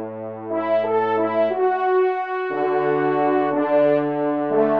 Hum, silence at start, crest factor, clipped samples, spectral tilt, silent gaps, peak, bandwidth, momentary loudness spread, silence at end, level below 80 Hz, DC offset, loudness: none; 0 s; 12 dB; under 0.1%; -9 dB/octave; none; -6 dBFS; 5.2 kHz; 6 LU; 0 s; -74 dBFS; 0.1%; -20 LUFS